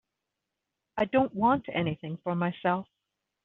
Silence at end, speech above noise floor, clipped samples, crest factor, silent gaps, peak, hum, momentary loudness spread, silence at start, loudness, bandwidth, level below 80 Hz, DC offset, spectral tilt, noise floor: 0.6 s; 58 dB; under 0.1%; 20 dB; none; -12 dBFS; none; 8 LU; 0.95 s; -29 LUFS; 4.1 kHz; -64 dBFS; under 0.1%; -5.5 dB/octave; -86 dBFS